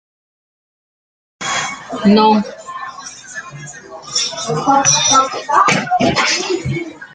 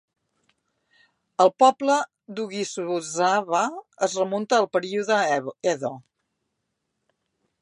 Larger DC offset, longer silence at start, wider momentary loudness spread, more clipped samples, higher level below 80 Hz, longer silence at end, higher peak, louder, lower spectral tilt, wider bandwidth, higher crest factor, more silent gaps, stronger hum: neither; about the same, 1.4 s vs 1.4 s; first, 19 LU vs 13 LU; neither; first, -52 dBFS vs -80 dBFS; second, 0.1 s vs 1.6 s; first, 0 dBFS vs -4 dBFS; first, -14 LUFS vs -23 LUFS; about the same, -3 dB/octave vs -3.5 dB/octave; second, 9.6 kHz vs 11 kHz; second, 16 dB vs 22 dB; neither; neither